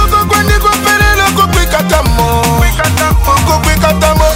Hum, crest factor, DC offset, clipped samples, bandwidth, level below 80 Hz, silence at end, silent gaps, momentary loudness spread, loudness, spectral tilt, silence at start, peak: none; 8 dB; under 0.1%; under 0.1%; 16.5 kHz; -14 dBFS; 0 s; none; 2 LU; -9 LUFS; -4 dB/octave; 0 s; 0 dBFS